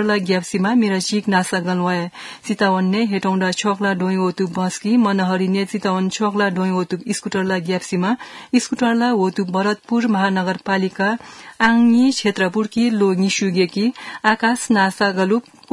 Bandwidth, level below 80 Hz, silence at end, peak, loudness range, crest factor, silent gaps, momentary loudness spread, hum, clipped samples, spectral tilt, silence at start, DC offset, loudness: 12 kHz; -62 dBFS; 0.3 s; 0 dBFS; 3 LU; 18 dB; none; 5 LU; none; under 0.1%; -5 dB/octave; 0 s; under 0.1%; -18 LUFS